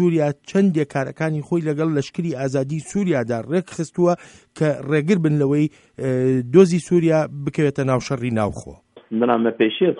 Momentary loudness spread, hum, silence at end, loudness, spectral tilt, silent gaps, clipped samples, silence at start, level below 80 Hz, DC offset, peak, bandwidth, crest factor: 8 LU; none; 0 s; -20 LUFS; -7 dB/octave; none; under 0.1%; 0 s; -54 dBFS; under 0.1%; 0 dBFS; 11 kHz; 20 dB